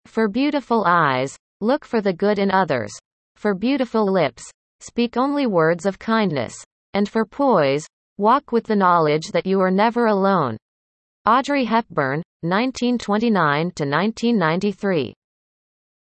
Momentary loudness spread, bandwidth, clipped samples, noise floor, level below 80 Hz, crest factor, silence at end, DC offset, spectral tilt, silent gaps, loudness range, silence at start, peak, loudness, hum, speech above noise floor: 9 LU; 8.8 kHz; under 0.1%; under -90 dBFS; -60 dBFS; 16 dB; 0.9 s; under 0.1%; -6 dB/octave; 1.39-1.60 s, 3.05-3.35 s, 4.54-4.79 s, 6.66-6.93 s, 7.93-8.16 s, 10.62-11.25 s, 12.25-12.40 s; 3 LU; 0.15 s; -4 dBFS; -20 LUFS; none; over 71 dB